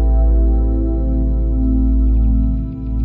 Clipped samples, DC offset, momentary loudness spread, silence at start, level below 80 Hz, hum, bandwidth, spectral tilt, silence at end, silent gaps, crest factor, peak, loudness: under 0.1%; under 0.1%; 4 LU; 0 s; -14 dBFS; none; 1.4 kHz; -14 dB/octave; 0 s; none; 8 dB; -6 dBFS; -17 LUFS